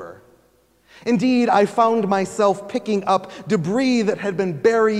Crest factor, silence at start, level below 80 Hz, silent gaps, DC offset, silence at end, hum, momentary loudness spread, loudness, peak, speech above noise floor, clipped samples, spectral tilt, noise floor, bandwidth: 16 dB; 0 s; -64 dBFS; none; under 0.1%; 0 s; none; 7 LU; -19 LUFS; -4 dBFS; 40 dB; under 0.1%; -6 dB/octave; -58 dBFS; 12 kHz